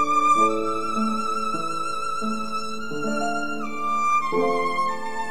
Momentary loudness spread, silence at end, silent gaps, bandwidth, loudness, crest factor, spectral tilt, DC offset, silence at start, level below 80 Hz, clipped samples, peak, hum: 10 LU; 0 s; none; 16 kHz; -24 LUFS; 16 dB; -4 dB/octave; 3%; 0 s; -60 dBFS; under 0.1%; -8 dBFS; none